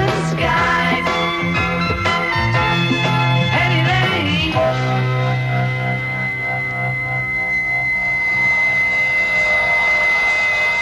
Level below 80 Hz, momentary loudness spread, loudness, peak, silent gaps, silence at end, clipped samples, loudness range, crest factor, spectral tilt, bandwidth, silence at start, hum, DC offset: -38 dBFS; 6 LU; -16 LUFS; -4 dBFS; none; 0 s; under 0.1%; 4 LU; 12 dB; -5.5 dB/octave; 13 kHz; 0 s; none; under 0.1%